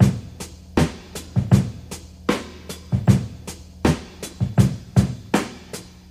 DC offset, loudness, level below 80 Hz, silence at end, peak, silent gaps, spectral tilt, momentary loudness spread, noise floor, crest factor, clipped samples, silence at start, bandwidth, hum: under 0.1%; -22 LUFS; -36 dBFS; 0.25 s; -2 dBFS; none; -6.5 dB/octave; 17 LU; -38 dBFS; 20 dB; under 0.1%; 0 s; 15 kHz; none